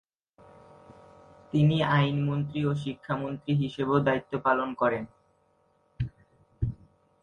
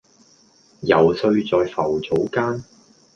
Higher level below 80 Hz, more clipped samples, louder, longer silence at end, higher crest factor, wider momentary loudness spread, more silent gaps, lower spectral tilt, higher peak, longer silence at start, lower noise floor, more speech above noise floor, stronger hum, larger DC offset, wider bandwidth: about the same, -52 dBFS vs -54 dBFS; neither; second, -28 LUFS vs -20 LUFS; about the same, 0.5 s vs 0.5 s; about the same, 18 dB vs 20 dB; first, 13 LU vs 9 LU; neither; first, -8.5 dB/octave vs -7 dB/octave; second, -10 dBFS vs -2 dBFS; first, 1.55 s vs 0.8 s; first, -68 dBFS vs -55 dBFS; first, 41 dB vs 36 dB; neither; neither; about the same, 7 kHz vs 7.2 kHz